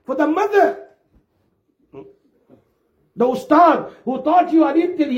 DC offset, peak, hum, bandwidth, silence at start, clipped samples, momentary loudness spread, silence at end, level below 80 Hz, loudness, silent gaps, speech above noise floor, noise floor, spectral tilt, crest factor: under 0.1%; -2 dBFS; none; 8.8 kHz; 0.1 s; under 0.1%; 9 LU; 0 s; -66 dBFS; -16 LUFS; none; 49 dB; -65 dBFS; -6 dB/octave; 16 dB